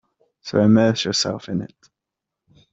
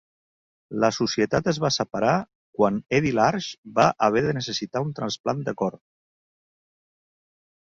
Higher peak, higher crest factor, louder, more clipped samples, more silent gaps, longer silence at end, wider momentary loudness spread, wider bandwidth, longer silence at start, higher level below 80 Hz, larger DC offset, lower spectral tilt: about the same, -4 dBFS vs -4 dBFS; about the same, 18 dB vs 22 dB; first, -19 LUFS vs -24 LUFS; neither; second, none vs 2.35-2.53 s, 3.58-3.63 s, 5.20-5.24 s; second, 1.05 s vs 1.9 s; first, 18 LU vs 8 LU; about the same, 7.8 kHz vs 7.8 kHz; second, 0.45 s vs 0.7 s; about the same, -60 dBFS vs -56 dBFS; neither; about the same, -5 dB/octave vs -5 dB/octave